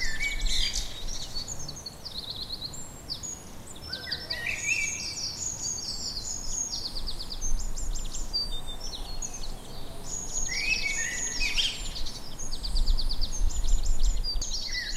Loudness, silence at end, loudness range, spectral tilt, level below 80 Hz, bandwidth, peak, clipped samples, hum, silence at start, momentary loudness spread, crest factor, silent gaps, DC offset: -31 LUFS; 0 s; 5 LU; -1 dB/octave; -32 dBFS; 15 kHz; -12 dBFS; under 0.1%; none; 0 s; 11 LU; 16 dB; none; under 0.1%